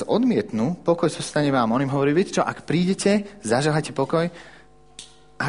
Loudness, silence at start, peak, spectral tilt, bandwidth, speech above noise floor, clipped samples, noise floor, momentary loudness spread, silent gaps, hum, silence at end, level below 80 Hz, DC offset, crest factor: -22 LUFS; 0 s; -6 dBFS; -5.5 dB/octave; 11 kHz; 25 dB; under 0.1%; -46 dBFS; 4 LU; none; none; 0 s; -56 dBFS; 0.2%; 16 dB